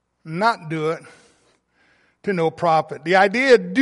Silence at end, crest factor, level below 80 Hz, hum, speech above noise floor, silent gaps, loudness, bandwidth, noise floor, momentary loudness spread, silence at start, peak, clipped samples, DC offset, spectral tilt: 0 s; 18 dB; -66 dBFS; none; 43 dB; none; -19 LUFS; 11.5 kHz; -61 dBFS; 13 LU; 0.25 s; -2 dBFS; under 0.1%; under 0.1%; -5.5 dB/octave